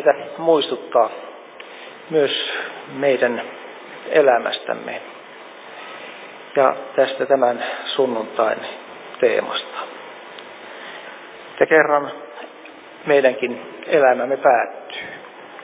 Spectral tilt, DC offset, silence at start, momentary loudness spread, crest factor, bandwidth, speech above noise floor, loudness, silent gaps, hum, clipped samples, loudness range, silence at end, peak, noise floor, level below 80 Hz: -8 dB/octave; under 0.1%; 0 s; 21 LU; 20 dB; 4 kHz; 22 dB; -19 LUFS; none; none; under 0.1%; 4 LU; 0 s; 0 dBFS; -40 dBFS; -76 dBFS